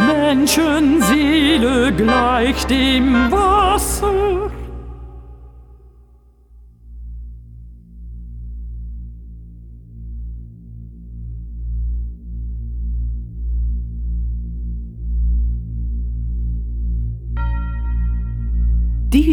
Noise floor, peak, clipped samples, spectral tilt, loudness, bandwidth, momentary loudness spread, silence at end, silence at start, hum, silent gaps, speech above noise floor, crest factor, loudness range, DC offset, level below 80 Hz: -48 dBFS; -2 dBFS; under 0.1%; -5 dB/octave; -18 LUFS; 19 kHz; 23 LU; 0 s; 0 s; 60 Hz at -50 dBFS; none; 34 dB; 16 dB; 22 LU; under 0.1%; -24 dBFS